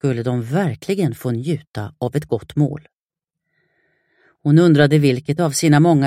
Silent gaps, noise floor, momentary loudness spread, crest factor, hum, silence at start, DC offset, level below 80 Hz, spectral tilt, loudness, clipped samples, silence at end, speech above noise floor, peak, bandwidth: 1.67-1.73 s, 2.95-3.09 s; -85 dBFS; 12 LU; 18 dB; none; 0.05 s; under 0.1%; -56 dBFS; -6.5 dB/octave; -18 LUFS; under 0.1%; 0 s; 69 dB; 0 dBFS; 15.5 kHz